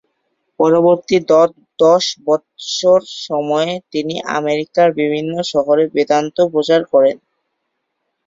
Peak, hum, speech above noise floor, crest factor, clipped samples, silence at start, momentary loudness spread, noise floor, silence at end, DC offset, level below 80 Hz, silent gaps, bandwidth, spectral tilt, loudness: -2 dBFS; none; 58 dB; 14 dB; under 0.1%; 0.6 s; 8 LU; -72 dBFS; 1.1 s; under 0.1%; -60 dBFS; none; 7.8 kHz; -4.5 dB/octave; -15 LUFS